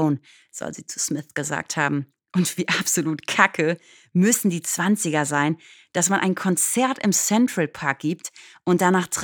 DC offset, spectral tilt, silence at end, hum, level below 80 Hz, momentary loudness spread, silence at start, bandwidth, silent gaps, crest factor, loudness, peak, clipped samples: under 0.1%; -4 dB/octave; 0 s; none; -70 dBFS; 12 LU; 0 s; over 20 kHz; none; 22 dB; -22 LUFS; 0 dBFS; under 0.1%